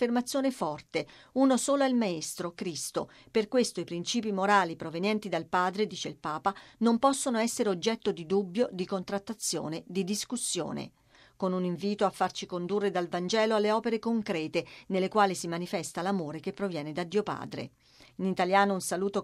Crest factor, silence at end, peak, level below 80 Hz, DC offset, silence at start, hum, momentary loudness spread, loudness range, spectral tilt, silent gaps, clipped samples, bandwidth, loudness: 20 dB; 0 s; -10 dBFS; -70 dBFS; under 0.1%; 0 s; none; 10 LU; 3 LU; -4.5 dB/octave; none; under 0.1%; 15 kHz; -30 LUFS